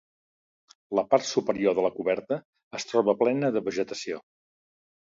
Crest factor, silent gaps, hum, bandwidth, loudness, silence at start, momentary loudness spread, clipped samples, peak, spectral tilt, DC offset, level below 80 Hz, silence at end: 20 dB; 2.45-2.53 s, 2.63-2.71 s; none; 7.8 kHz; -27 LUFS; 0.9 s; 11 LU; under 0.1%; -8 dBFS; -5 dB/octave; under 0.1%; -70 dBFS; 0.9 s